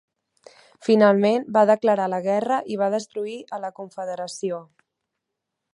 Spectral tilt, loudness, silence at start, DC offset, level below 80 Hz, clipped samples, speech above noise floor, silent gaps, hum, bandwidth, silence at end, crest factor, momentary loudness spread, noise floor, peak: -6 dB/octave; -22 LUFS; 0.8 s; under 0.1%; -76 dBFS; under 0.1%; 61 dB; none; none; 11 kHz; 1.15 s; 20 dB; 15 LU; -82 dBFS; -2 dBFS